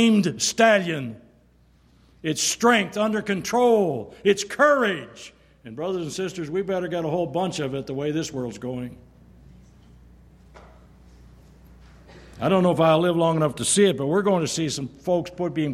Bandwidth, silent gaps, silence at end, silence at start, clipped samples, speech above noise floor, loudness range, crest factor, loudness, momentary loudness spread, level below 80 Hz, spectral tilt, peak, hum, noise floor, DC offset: 15.5 kHz; none; 0 s; 0 s; under 0.1%; 35 dB; 11 LU; 18 dB; -22 LUFS; 13 LU; -56 dBFS; -4.5 dB/octave; -6 dBFS; none; -57 dBFS; under 0.1%